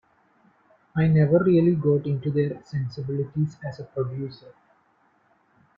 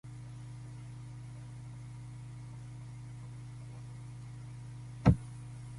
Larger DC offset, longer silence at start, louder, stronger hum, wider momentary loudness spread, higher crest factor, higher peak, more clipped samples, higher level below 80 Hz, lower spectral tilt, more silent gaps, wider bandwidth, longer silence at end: neither; first, 0.95 s vs 0.05 s; first, -24 LUFS vs -40 LUFS; neither; second, 14 LU vs 17 LU; second, 18 dB vs 28 dB; about the same, -8 dBFS vs -10 dBFS; neither; second, -58 dBFS vs -50 dBFS; first, -10.5 dB/octave vs -8 dB/octave; neither; second, 5.4 kHz vs 11.5 kHz; first, 1.45 s vs 0 s